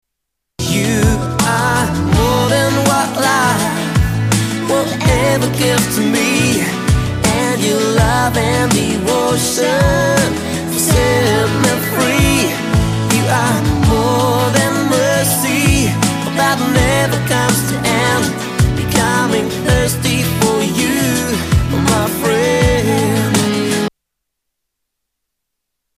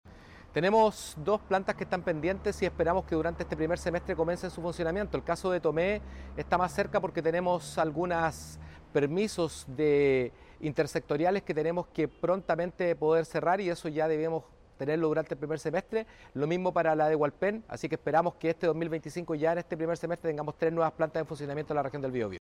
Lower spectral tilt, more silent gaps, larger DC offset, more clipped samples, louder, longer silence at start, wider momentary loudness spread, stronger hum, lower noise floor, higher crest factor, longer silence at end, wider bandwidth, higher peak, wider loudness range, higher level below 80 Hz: second, -4.5 dB/octave vs -6 dB/octave; neither; neither; neither; first, -14 LUFS vs -30 LUFS; first, 0.6 s vs 0.05 s; second, 3 LU vs 8 LU; neither; first, -77 dBFS vs -51 dBFS; about the same, 14 dB vs 16 dB; first, 2.1 s vs 0 s; about the same, 15.5 kHz vs 15.5 kHz; first, 0 dBFS vs -14 dBFS; about the same, 1 LU vs 2 LU; first, -28 dBFS vs -52 dBFS